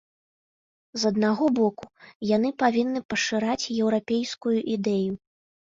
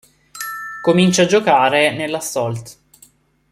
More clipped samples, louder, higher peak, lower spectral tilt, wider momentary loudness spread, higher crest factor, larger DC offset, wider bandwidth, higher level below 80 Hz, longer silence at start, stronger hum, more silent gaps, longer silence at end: neither; second, -25 LUFS vs -16 LUFS; second, -8 dBFS vs -2 dBFS; about the same, -5 dB/octave vs -4.5 dB/octave; second, 7 LU vs 14 LU; about the same, 18 dB vs 16 dB; neither; second, 7.6 kHz vs 15 kHz; second, -66 dBFS vs -58 dBFS; first, 0.95 s vs 0.35 s; neither; first, 2.15-2.20 s, 3.05-3.09 s vs none; second, 0.65 s vs 0.8 s